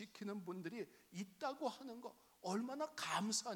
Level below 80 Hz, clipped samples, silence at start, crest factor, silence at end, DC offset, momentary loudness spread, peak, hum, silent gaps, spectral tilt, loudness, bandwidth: under -90 dBFS; under 0.1%; 0 s; 20 dB; 0 s; under 0.1%; 12 LU; -26 dBFS; none; none; -3.5 dB/octave; -46 LUFS; 19 kHz